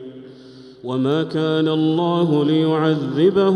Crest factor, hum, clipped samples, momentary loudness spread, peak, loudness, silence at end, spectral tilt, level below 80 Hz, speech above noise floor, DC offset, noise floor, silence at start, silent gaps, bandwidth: 14 dB; none; under 0.1%; 7 LU; -6 dBFS; -18 LUFS; 0 s; -8 dB/octave; -64 dBFS; 24 dB; under 0.1%; -42 dBFS; 0 s; none; 8.8 kHz